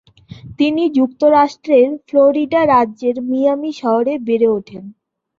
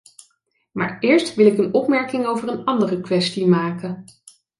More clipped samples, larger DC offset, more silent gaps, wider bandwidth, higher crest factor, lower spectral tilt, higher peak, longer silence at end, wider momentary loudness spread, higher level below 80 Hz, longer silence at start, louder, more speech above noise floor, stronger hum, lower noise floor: neither; neither; neither; second, 7.4 kHz vs 11.5 kHz; about the same, 14 dB vs 18 dB; about the same, -6.5 dB/octave vs -6 dB/octave; about the same, -2 dBFS vs -2 dBFS; about the same, 0.5 s vs 0.55 s; second, 7 LU vs 12 LU; first, -56 dBFS vs -64 dBFS; second, 0.45 s vs 0.75 s; first, -15 LUFS vs -19 LUFS; second, 22 dB vs 48 dB; neither; second, -36 dBFS vs -66 dBFS